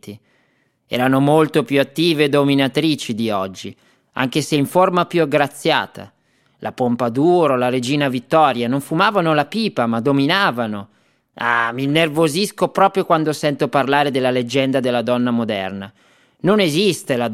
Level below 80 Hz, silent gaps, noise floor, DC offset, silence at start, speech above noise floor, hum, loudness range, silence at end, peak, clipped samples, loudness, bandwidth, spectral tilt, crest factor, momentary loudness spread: -64 dBFS; none; -62 dBFS; under 0.1%; 0.05 s; 45 dB; none; 2 LU; 0 s; 0 dBFS; under 0.1%; -17 LUFS; 16 kHz; -5.5 dB/octave; 18 dB; 9 LU